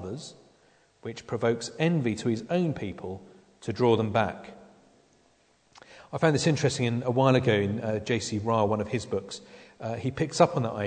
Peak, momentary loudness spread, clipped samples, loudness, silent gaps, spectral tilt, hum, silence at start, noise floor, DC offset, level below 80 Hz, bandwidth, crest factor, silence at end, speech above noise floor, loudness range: -6 dBFS; 17 LU; under 0.1%; -27 LUFS; none; -6 dB/octave; none; 0 s; -65 dBFS; under 0.1%; -62 dBFS; 9.4 kHz; 22 dB; 0 s; 38 dB; 5 LU